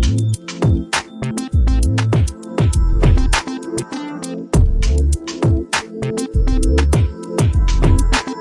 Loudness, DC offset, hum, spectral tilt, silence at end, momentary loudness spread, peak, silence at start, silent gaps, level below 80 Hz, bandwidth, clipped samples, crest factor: -18 LUFS; under 0.1%; none; -5.5 dB/octave; 0 s; 9 LU; -2 dBFS; 0 s; none; -18 dBFS; 11.5 kHz; under 0.1%; 14 dB